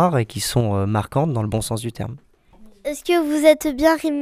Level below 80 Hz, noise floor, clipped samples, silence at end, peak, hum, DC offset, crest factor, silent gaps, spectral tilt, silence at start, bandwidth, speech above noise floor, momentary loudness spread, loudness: -44 dBFS; -47 dBFS; under 0.1%; 0 s; 0 dBFS; none; under 0.1%; 20 dB; none; -5.5 dB/octave; 0 s; 16 kHz; 28 dB; 14 LU; -20 LUFS